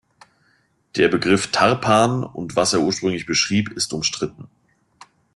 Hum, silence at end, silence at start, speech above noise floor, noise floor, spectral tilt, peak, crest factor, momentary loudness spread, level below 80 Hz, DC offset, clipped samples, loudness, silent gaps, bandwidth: none; 0.9 s; 0.95 s; 43 dB; -63 dBFS; -4 dB/octave; -2 dBFS; 18 dB; 9 LU; -54 dBFS; under 0.1%; under 0.1%; -19 LUFS; none; 12.5 kHz